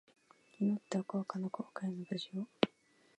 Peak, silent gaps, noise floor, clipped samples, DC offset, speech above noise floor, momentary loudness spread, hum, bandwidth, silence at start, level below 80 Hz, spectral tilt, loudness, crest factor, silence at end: -10 dBFS; none; -69 dBFS; under 0.1%; under 0.1%; 32 dB; 6 LU; none; 9 kHz; 0.6 s; -86 dBFS; -6.5 dB/octave; -39 LUFS; 30 dB; 0.5 s